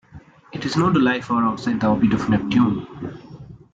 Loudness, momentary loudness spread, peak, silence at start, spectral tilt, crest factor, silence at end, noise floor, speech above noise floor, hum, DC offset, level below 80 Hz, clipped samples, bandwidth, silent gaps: -20 LUFS; 17 LU; -6 dBFS; 0.15 s; -7 dB/octave; 14 dB; 0.15 s; -45 dBFS; 26 dB; none; under 0.1%; -48 dBFS; under 0.1%; 7.8 kHz; none